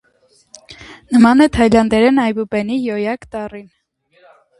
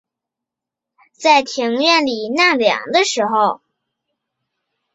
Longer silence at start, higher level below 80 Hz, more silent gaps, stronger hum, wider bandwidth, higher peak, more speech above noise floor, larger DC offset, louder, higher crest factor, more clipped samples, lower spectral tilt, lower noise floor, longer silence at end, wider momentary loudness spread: second, 0.7 s vs 1.2 s; first, -40 dBFS vs -68 dBFS; neither; neither; first, 11.5 kHz vs 8 kHz; about the same, 0 dBFS vs -2 dBFS; second, 42 dB vs 69 dB; neither; about the same, -14 LUFS vs -15 LUFS; about the same, 16 dB vs 18 dB; neither; first, -6 dB/octave vs -2 dB/octave; second, -56 dBFS vs -85 dBFS; second, 1 s vs 1.4 s; first, 17 LU vs 6 LU